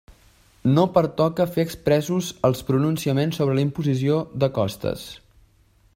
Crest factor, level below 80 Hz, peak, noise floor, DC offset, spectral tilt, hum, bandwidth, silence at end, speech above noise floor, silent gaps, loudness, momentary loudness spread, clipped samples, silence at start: 18 dB; -52 dBFS; -4 dBFS; -58 dBFS; under 0.1%; -7 dB/octave; none; 16 kHz; 0.8 s; 37 dB; none; -22 LUFS; 6 LU; under 0.1%; 0.65 s